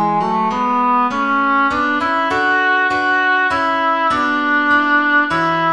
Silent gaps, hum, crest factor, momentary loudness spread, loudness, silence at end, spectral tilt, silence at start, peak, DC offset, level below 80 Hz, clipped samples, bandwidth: none; none; 12 dB; 3 LU; -15 LUFS; 0 s; -5 dB/octave; 0 s; -2 dBFS; 0.4%; -50 dBFS; under 0.1%; 10.5 kHz